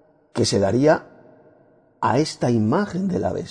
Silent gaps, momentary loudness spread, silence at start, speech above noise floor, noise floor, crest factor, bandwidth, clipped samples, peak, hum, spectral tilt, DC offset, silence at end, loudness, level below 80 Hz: none; 6 LU; 0.35 s; 36 dB; -55 dBFS; 18 dB; 10 kHz; under 0.1%; -4 dBFS; none; -6 dB/octave; under 0.1%; 0 s; -21 LUFS; -54 dBFS